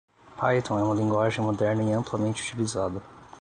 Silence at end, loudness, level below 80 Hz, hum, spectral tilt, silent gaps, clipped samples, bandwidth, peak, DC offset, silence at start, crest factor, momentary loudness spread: 0 s; -26 LUFS; -54 dBFS; none; -6 dB/octave; none; under 0.1%; 11 kHz; -10 dBFS; under 0.1%; 0.3 s; 18 dB; 5 LU